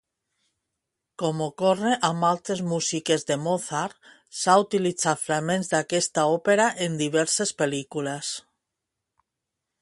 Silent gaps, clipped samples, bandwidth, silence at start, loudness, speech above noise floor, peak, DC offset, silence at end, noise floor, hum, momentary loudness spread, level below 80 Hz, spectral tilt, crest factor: none; under 0.1%; 11.5 kHz; 1.2 s; -24 LUFS; 60 dB; -4 dBFS; under 0.1%; 1.4 s; -84 dBFS; none; 9 LU; -70 dBFS; -3.5 dB/octave; 22 dB